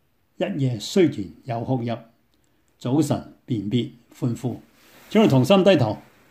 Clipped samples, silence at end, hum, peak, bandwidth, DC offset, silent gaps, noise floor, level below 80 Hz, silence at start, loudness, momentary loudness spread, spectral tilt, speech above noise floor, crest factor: under 0.1%; 0.3 s; none; -2 dBFS; 15.5 kHz; under 0.1%; none; -65 dBFS; -60 dBFS; 0.4 s; -22 LUFS; 17 LU; -6.5 dB/octave; 44 dB; 20 dB